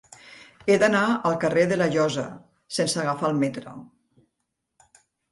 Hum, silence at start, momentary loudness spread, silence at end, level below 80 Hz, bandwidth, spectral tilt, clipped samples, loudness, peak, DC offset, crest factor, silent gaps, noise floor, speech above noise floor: none; 0.25 s; 18 LU; 1.5 s; -64 dBFS; 11.5 kHz; -5 dB/octave; under 0.1%; -23 LUFS; -6 dBFS; under 0.1%; 20 dB; none; -79 dBFS; 57 dB